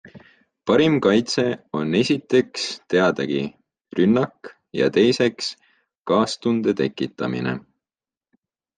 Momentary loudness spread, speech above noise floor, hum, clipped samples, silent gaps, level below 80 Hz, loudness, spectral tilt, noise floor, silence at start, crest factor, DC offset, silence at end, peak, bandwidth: 12 LU; over 70 dB; none; under 0.1%; 5.98-6.02 s; -62 dBFS; -21 LUFS; -5.5 dB/octave; under -90 dBFS; 0.05 s; 18 dB; under 0.1%; 1.15 s; -4 dBFS; 9.6 kHz